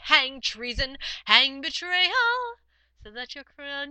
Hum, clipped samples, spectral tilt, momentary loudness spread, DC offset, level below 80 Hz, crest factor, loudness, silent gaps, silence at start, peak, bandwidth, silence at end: none; under 0.1%; -1.5 dB/octave; 20 LU; under 0.1%; -46 dBFS; 26 dB; -23 LUFS; none; 0 s; 0 dBFS; 8.8 kHz; 0 s